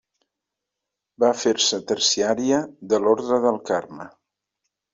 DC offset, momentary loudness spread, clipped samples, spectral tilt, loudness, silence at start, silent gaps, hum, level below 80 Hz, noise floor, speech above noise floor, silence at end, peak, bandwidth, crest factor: under 0.1%; 7 LU; under 0.1%; -2.5 dB/octave; -21 LUFS; 1.2 s; none; none; -66 dBFS; -84 dBFS; 63 dB; 0.85 s; -4 dBFS; 7.8 kHz; 18 dB